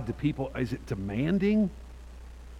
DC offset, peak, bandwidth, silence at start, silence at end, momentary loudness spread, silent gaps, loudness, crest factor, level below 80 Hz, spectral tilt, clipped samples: under 0.1%; -16 dBFS; 10.5 kHz; 0 s; 0 s; 22 LU; none; -29 LUFS; 14 dB; -44 dBFS; -8 dB/octave; under 0.1%